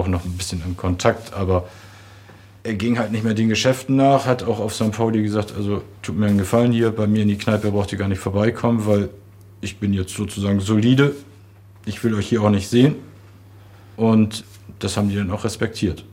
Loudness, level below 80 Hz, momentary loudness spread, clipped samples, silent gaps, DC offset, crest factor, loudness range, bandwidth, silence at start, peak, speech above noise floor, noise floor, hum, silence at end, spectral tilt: -20 LUFS; -50 dBFS; 10 LU; under 0.1%; none; under 0.1%; 18 dB; 2 LU; 16 kHz; 0 s; -2 dBFS; 26 dB; -45 dBFS; none; 0.05 s; -6.5 dB/octave